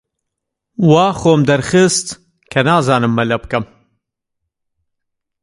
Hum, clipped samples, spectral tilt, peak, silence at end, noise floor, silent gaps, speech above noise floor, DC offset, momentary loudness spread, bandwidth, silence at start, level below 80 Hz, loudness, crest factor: none; under 0.1%; -5 dB/octave; 0 dBFS; 1.8 s; -78 dBFS; none; 65 dB; under 0.1%; 15 LU; 11.5 kHz; 0.8 s; -46 dBFS; -14 LUFS; 16 dB